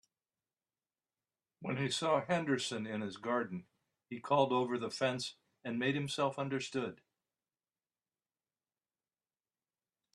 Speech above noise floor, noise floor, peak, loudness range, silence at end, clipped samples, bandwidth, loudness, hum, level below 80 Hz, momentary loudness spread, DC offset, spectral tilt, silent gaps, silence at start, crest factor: over 55 dB; under -90 dBFS; -16 dBFS; 7 LU; 3.2 s; under 0.1%; 12.5 kHz; -36 LUFS; none; -80 dBFS; 12 LU; under 0.1%; -5 dB/octave; none; 1.6 s; 22 dB